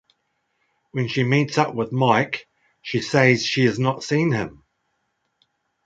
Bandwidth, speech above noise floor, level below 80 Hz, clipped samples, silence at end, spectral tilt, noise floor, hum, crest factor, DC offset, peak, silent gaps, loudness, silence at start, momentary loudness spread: 8.6 kHz; 53 dB; -60 dBFS; under 0.1%; 1.35 s; -5.5 dB/octave; -73 dBFS; none; 20 dB; under 0.1%; -2 dBFS; none; -21 LUFS; 0.95 s; 12 LU